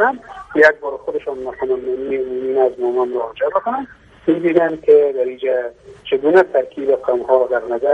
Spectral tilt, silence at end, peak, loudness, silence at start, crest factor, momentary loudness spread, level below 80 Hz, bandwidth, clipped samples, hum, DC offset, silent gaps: -6.5 dB/octave; 0 s; 0 dBFS; -17 LUFS; 0 s; 16 dB; 12 LU; -54 dBFS; 8 kHz; under 0.1%; none; under 0.1%; none